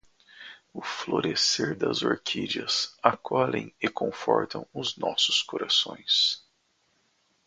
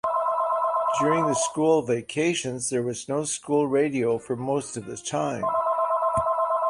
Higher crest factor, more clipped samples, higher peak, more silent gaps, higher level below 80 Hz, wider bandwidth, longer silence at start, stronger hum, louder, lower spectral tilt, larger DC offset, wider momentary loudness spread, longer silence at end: first, 28 dB vs 16 dB; neither; first, -2 dBFS vs -8 dBFS; neither; second, -68 dBFS vs -60 dBFS; second, 9.6 kHz vs 11.5 kHz; first, 0.35 s vs 0.05 s; neither; about the same, -26 LUFS vs -25 LUFS; second, -2.5 dB/octave vs -4.5 dB/octave; neither; first, 12 LU vs 6 LU; first, 1.1 s vs 0 s